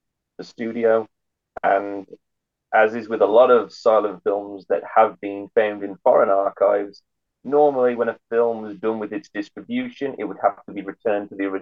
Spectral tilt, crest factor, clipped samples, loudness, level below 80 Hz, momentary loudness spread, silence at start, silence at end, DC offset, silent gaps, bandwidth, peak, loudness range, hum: -6.5 dB/octave; 18 dB; under 0.1%; -21 LUFS; -72 dBFS; 15 LU; 0.4 s; 0 s; under 0.1%; none; 7.2 kHz; -4 dBFS; 5 LU; none